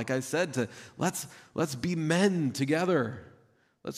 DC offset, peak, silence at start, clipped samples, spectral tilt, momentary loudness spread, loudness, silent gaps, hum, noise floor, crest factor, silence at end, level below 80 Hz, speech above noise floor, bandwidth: under 0.1%; -14 dBFS; 0 s; under 0.1%; -5 dB/octave; 12 LU; -30 LUFS; none; none; -64 dBFS; 16 dB; 0 s; -68 dBFS; 35 dB; 15.5 kHz